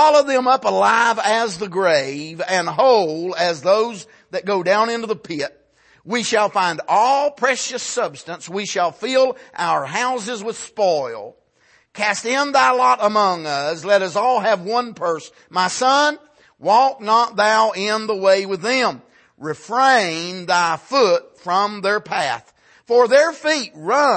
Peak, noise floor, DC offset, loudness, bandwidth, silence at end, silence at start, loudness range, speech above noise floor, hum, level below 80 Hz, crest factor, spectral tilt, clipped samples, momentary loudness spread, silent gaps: -2 dBFS; -57 dBFS; under 0.1%; -18 LUFS; 8.8 kHz; 0 s; 0 s; 4 LU; 39 dB; none; -70 dBFS; 16 dB; -3 dB/octave; under 0.1%; 11 LU; none